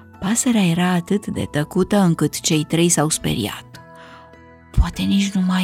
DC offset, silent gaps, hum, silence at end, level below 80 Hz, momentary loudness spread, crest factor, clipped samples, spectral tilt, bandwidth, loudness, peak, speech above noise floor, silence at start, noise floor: under 0.1%; none; none; 0 s; -32 dBFS; 7 LU; 16 dB; under 0.1%; -4.5 dB/octave; 16 kHz; -19 LUFS; -4 dBFS; 26 dB; 0.15 s; -45 dBFS